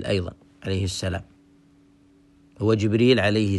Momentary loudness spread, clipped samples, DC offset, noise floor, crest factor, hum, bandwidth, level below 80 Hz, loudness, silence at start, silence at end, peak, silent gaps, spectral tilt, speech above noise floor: 16 LU; under 0.1%; under 0.1%; -56 dBFS; 18 dB; none; 12 kHz; -52 dBFS; -23 LUFS; 0 s; 0 s; -6 dBFS; none; -6 dB/octave; 34 dB